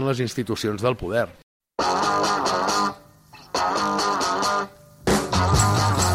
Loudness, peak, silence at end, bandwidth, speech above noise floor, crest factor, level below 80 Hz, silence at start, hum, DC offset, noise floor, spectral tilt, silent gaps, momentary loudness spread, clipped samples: -22 LUFS; -6 dBFS; 0 s; 16.5 kHz; 24 dB; 18 dB; -42 dBFS; 0 s; none; under 0.1%; -48 dBFS; -4 dB/octave; 1.43-1.60 s; 8 LU; under 0.1%